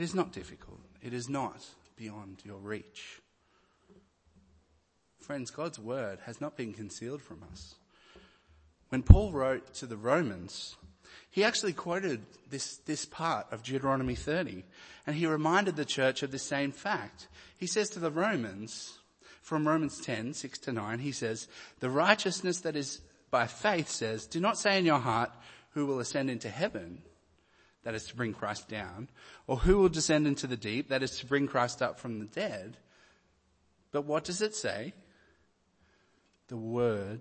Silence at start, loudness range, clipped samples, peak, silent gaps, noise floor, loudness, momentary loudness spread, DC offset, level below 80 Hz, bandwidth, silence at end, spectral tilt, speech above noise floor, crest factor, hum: 0 s; 12 LU; under 0.1%; -2 dBFS; none; -71 dBFS; -32 LUFS; 19 LU; under 0.1%; -42 dBFS; 8.8 kHz; 0 s; -5 dB/octave; 39 dB; 32 dB; none